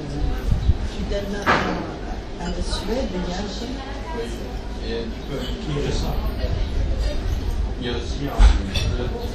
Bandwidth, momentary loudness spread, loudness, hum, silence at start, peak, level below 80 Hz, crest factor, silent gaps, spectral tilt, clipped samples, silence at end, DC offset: 13.5 kHz; 10 LU; -25 LUFS; none; 0 s; -4 dBFS; -24 dBFS; 20 dB; none; -5.5 dB/octave; under 0.1%; 0 s; under 0.1%